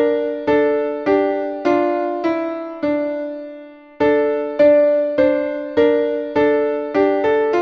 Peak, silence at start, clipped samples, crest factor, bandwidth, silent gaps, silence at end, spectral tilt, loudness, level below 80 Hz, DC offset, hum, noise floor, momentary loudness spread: -4 dBFS; 0 s; under 0.1%; 14 dB; 6.2 kHz; none; 0 s; -7 dB/octave; -18 LUFS; -54 dBFS; under 0.1%; none; -38 dBFS; 9 LU